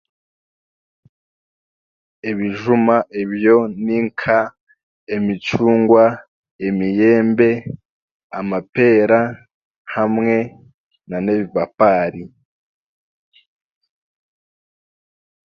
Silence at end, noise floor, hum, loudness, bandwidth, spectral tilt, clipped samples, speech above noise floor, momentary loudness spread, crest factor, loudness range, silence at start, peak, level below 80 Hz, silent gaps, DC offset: 3.3 s; under -90 dBFS; none; -17 LUFS; 7 kHz; -8 dB/octave; under 0.1%; over 74 dB; 14 LU; 18 dB; 5 LU; 2.25 s; 0 dBFS; -58 dBFS; 4.61-4.67 s, 4.83-5.07 s, 6.28-6.43 s, 6.51-6.59 s, 7.85-8.30 s, 8.69-8.73 s, 9.54-9.85 s, 10.74-10.90 s; under 0.1%